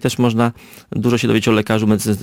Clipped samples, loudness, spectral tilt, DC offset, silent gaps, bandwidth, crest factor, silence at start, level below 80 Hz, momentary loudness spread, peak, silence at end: under 0.1%; -16 LUFS; -6 dB/octave; under 0.1%; none; 17 kHz; 14 dB; 0 s; -48 dBFS; 5 LU; -4 dBFS; 0 s